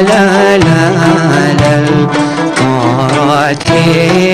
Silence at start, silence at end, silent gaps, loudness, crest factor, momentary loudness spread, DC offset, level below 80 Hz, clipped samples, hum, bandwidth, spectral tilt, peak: 0 s; 0 s; none; -9 LUFS; 8 dB; 4 LU; under 0.1%; -38 dBFS; under 0.1%; none; 14 kHz; -6 dB/octave; 0 dBFS